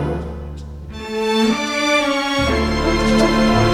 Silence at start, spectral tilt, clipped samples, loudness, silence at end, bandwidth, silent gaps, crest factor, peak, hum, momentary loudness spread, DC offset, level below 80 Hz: 0 s; -5 dB/octave; under 0.1%; -17 LUFS; 0 s; 15.5 kHz; none; 14 dB; -4 dBFS; none; 16 LU; under 0.1%; -30 dBFS